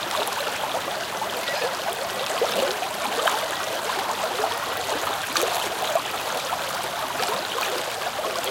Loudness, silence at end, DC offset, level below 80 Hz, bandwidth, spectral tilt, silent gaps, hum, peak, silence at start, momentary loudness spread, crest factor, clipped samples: -25 LUFS; 0 s; under 0.1%; -60 dBFS; 17 kHz; -1 dB/octave; none; none; -4 dBFS; 0 s; 4 LU; 22 dB; under 0.1%